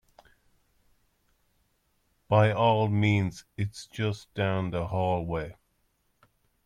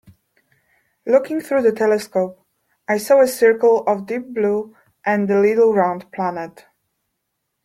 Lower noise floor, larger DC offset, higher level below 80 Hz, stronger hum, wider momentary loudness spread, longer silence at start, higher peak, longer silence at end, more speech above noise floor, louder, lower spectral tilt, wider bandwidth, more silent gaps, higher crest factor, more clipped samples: about the same, -72 dBFS vs -75 dBFS; neither; first, -56 dBFS vs -66 dBFS; neither; about the same, 12 LU vs 12 LU; first, 2.3 s vs 1.05 s; second, -10 dBFS vs -2 dBFS; about the same, 1.15 s vs 1.15 s; second, 46 dB vs 58 dB; second, -28 LUFS vs -18 LUFS; first, -7 dB/octave vs -5.5 dB/octave; second, 11 kHz vs 15.5 kHz; neither; about the same, 20 dB vs 16 dB; neither